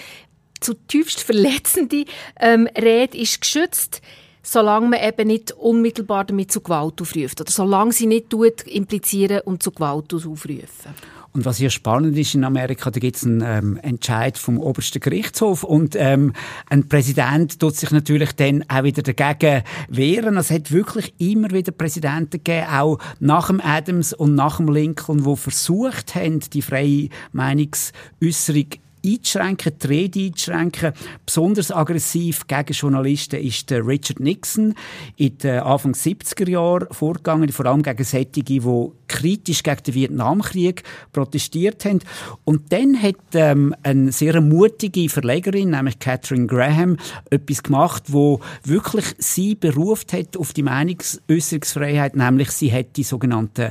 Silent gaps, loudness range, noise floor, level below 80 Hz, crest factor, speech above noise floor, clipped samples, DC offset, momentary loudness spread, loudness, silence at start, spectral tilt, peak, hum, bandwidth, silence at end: none; 4 LU; -45 dBFS; -54 dBFS; 16 dB; 26 dB; under 0.1%; under 0.1%; 8 LU; -19 LUFS; 0 s; -5.5 dB/octave; -2 dBFS; none; 15.5 kHz; 0 s